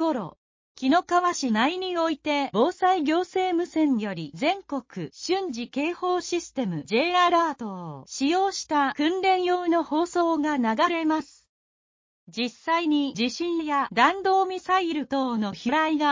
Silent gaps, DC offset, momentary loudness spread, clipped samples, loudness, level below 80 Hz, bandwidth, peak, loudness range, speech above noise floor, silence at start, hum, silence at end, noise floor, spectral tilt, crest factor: 0.38-0.75 s, 11.49-12.27 s; under 0.1%; 9 LU; under 0.1%; -25 LUFS; -66 dBFS; 7.6 kHz; -6 dBFS; 3 LU; over 66 dB; 0 s; none; 0 s; under -90 dBFS; -4 dB/octave; 20 dB